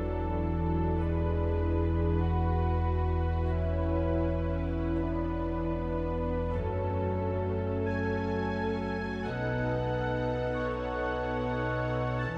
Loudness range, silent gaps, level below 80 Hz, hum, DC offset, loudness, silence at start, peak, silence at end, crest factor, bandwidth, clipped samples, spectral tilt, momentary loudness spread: 2 LU; none; -36 dBFS; none; under 0.1%; -31 LUFS; 0 s; -16 dBFS; 0 s; 14 dB; 5.8 kHz; under 0.1%; -9 dB/octave; 3 LU